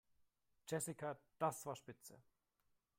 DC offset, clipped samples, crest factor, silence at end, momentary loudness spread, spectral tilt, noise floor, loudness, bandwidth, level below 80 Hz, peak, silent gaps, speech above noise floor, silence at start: under 0.1%; under 0.1%; 22 dB; 0.8 s; 17 LU; -4.5 dB/octave; -84 dBFS; -46 LUFS; 16.5 kHz; -86 dBFS; -26 dBFS; none; 37 dB; 0.65 s